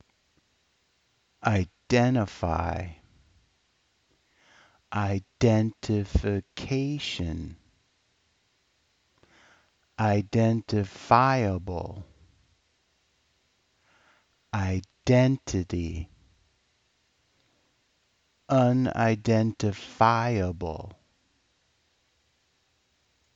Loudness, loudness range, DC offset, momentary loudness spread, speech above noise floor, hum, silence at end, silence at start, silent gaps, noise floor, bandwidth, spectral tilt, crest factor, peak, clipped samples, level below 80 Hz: -26 LUFS; 9 LU; under 0.1%; 14 LU; 45 dB; none; 2.45 s; 1.4 s; none; -71 dBFS; 7.8 kHz; -7 dB/octave; 24 dB; -4 dBFS; under 0.1%; -46 dBFS